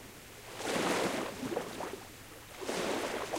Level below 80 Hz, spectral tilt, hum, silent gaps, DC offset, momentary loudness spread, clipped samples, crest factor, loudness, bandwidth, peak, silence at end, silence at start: -62 dBFS; -3.5 dB/octave; none; none; under 0.1%; 17 LU; under 0.1%; 18 dB; -36 LUFS; 16 kHz; -20 dBFS; 0 s; 0 s